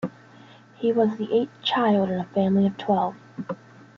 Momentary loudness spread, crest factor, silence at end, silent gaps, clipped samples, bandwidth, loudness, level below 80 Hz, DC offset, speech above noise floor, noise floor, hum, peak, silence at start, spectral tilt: 14 LU; 16 dB; 0.45 s; none; under 0.1%; 6.8 kHz; -23 LUFS; -68 dBFS; under 0.1%; 27 dB; -49 dBFS; none; -8 dBFS; 0 s; -8 dB/octave